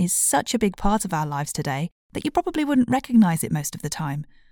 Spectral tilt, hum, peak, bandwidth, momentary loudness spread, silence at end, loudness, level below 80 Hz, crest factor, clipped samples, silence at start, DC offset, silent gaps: -4.5 dB/octave; none; -6 dBFS; 19 kHz; 11 LU; 0.25 s; -23 LUFS; -42 dBFS; 18 dB; under 0.1%; 0 s; under 0.1%; 1.92-2.10 s